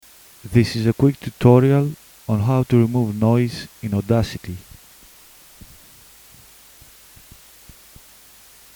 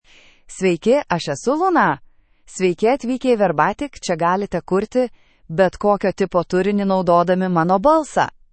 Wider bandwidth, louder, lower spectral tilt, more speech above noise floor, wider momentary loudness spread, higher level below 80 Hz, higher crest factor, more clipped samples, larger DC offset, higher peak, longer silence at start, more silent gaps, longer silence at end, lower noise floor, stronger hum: first, over 20 kHz vs 8.8 kHz; about the same, -19 LUFS vs -18 LUFS; first, -7.5 dB/octave vs -6 dB/octave; about the same, 30 dB vs 28 dB; first, 17 LU vs 7 LU; about the same, -46 dBFS vs -48 dBFS; about the same, 20 dB vs 16 dB; neither; neither; about the same, 0 dBFS vs -2 dBFS; about the same, 0.45 s vs 0.5 s; neither; first, 4.15 s vs 0.25 s; about the same, -47 dBFS vs -45 dBFS; neither